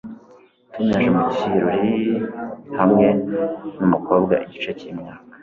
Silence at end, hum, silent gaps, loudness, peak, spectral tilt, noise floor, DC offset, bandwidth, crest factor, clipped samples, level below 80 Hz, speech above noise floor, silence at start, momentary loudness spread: 0.05 s; none; none; -20 LUFS; -2 dBFS; -8.5 dB/octave; -50 dBFS; under 0.1%; 7.2 kHz; 18 dB; under 0.1%; -54 dBFS; 31 dB; 0.05 s; 16 LU